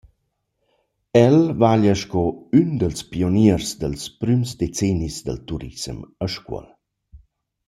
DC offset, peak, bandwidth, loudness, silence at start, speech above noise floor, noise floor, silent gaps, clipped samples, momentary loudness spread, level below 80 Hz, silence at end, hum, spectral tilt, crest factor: under 0.1%; -2 dBFS; 14.5 kHz; -20 LUFS; 1.15 s; 53 dB; -73 dBFS; none; under 0.1%; 15 LU; -44 dBFS; 0.5 s; none; -6.5 dB/octave; 18 dB